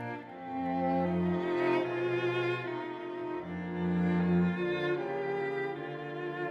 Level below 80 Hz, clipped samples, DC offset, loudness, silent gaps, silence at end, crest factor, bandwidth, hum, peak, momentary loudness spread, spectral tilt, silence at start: -64 dBFS; under 0.1%; under 0.1%; -33 LUFS; none; 0 s; 14 dB; 6.2 kHz; none; -20 dBFS; 9 LU; -8.5 dB/octave; 0 s